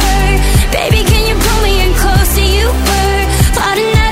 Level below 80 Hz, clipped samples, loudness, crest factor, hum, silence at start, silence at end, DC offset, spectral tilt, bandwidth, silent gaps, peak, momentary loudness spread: -12 dBFS; under 0.1%; -11 LUFS; 10 dB; none; 0 s; 0 s; under 0.1%; -4 dB/octave; 16.5 kHz; none; 0 dBFS; 1 LU